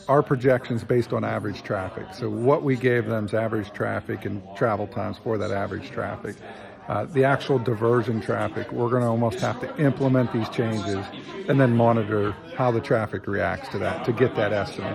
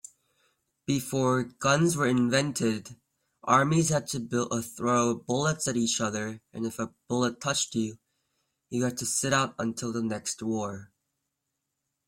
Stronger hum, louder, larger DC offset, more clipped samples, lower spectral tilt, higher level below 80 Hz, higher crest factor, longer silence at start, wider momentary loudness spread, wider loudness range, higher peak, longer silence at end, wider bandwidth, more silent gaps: neither; first, -24 LUFS vs -28 LUFS; neither; neither; first, -7.5 dB/octave vs -4.5 dB/octave; first, -58 dBFS vs -64 dBFS; about the same, 18 dB vs 20 dB; second, 0 s vs 0.9 s; about the same, 10 LU vs 11 LU; about the same, 4 LU vs 5 LU; about the same, -6 dBFS vs -8 dBFS; second, 0 s vs 1.25 s; second, 13 kHz vs 16.5 kHz; neither